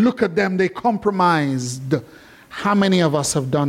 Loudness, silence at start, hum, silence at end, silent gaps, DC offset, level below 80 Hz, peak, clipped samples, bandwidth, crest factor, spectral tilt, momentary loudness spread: -19 LUFS; 0 s; none; 0 s; none; under 0.1%; -56 dBFS; -4 dBFS; under 0.1%; 15.5 kHz; 14 dB; -5.5 dB/octave; 8 LU